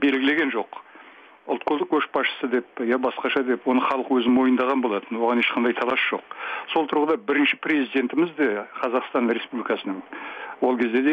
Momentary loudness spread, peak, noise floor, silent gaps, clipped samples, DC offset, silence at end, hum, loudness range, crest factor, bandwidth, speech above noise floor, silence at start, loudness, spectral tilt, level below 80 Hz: 10 LU; -10 dBFS; -48 dBFS; none; under 0.1%; under 0.1%; 0 s; none; 3 LU; 14 dB; 5.2 kHz; 25 dB; 0 s; -23 LUFS; -6.5 dB/octave; -70 dBFS